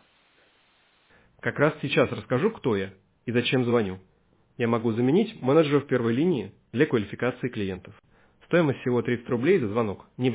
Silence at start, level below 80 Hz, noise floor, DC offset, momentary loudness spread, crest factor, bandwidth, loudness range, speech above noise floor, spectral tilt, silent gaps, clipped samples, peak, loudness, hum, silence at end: 1.45 s; -58 dBFS; -63 dBFS; under 0.1%; 9 LU; 18 dB; 4 kHz; 3 LU; 39 dB; -11 dB/octave; none; under 0.1%; -8 dBFS; -25 LUFS; none; 0 s